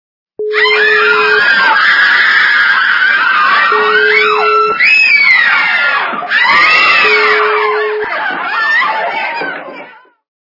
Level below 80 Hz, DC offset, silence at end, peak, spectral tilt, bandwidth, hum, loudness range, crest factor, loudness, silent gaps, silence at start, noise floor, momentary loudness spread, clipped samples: -58 dBFS; under 0.1%; 0.5 s; 0 dBFS; -2 dB/octave; 6 kHz; none; 3 LU; 10 dB; -8 LUFS; none; 0.4 s; -34 dBFS; 10 LU; 0.2%